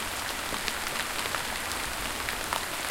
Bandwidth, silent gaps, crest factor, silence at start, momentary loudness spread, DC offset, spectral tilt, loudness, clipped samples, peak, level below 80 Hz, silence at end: 17 kHz; none; 24 dB; 0 s; 1 LU; under 0.1%; -1 dB/octave; -30 LUFS; under 0.1%; -8 dBFS; -48 dBFS; 0 s